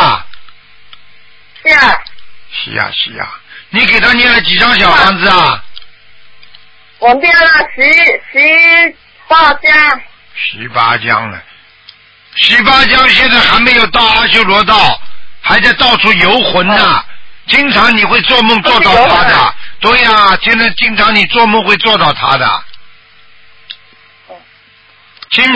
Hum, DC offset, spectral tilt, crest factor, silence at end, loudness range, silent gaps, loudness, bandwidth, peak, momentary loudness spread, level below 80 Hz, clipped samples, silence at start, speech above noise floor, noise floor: none; under 0.1%; -4 dB/octave; 10 dB; 0 s; 6 LU; none; -6 LUFS; 8 kHz; 0 dBFS; 11 LU; -36 dBFS; 0.5%; 0 s; 36 dB; -43 dBFS